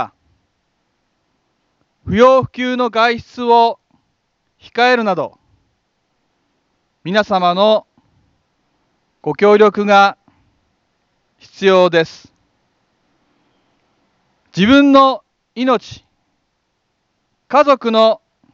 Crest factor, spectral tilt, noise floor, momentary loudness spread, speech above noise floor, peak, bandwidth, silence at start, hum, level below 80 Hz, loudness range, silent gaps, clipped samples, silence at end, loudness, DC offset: 16 dB; -6 dB/octave; -68 dBFS; 17 LU; 56 dB; 0 dBFS; 7.4 kHz; 0 s; none; -52 dBFS; 5 LU; none; under 0.1%; 0.35 s; -13 LUFS; under 0.1%